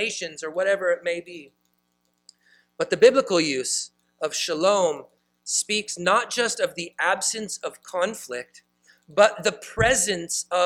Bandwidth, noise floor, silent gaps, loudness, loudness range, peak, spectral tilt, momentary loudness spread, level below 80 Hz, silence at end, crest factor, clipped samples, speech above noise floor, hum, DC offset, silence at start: 16 kHz; -71 dBFS; none; -23 LUFS; 3 LU; -4 dBFS; -2 dB/octave; 14 LU; -54 dBFS; 0 s; 22 dB; under 0.1%; 48 dB; 60 Hz at -55 dBFS; under 0.1%; 0 s